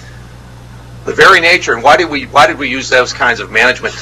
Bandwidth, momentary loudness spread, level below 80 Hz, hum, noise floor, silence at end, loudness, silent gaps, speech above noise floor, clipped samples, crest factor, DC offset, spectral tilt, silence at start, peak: 19 kHz; 8 LU; -38 dBFS; none; -32 dBFS; 0 s; -9 LUFS; none; 22 dB; 1%; 12 dB; under 0.1%; -3 dB/octave; 0 s; 0 dBFS